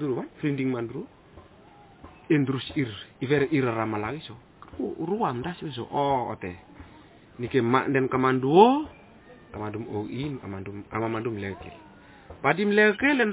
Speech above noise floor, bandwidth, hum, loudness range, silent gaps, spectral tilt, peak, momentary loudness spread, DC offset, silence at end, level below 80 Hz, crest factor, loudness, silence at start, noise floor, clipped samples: 27 dB; 4 kHz; none; 7 LU; none; -5 dB/octave; -4 dBFS; 18 LU; under 0.1%; 0 s; -56 dBFS; 22 dB; -26 LUFS; 0 s; -52 dBFS; under 0.1%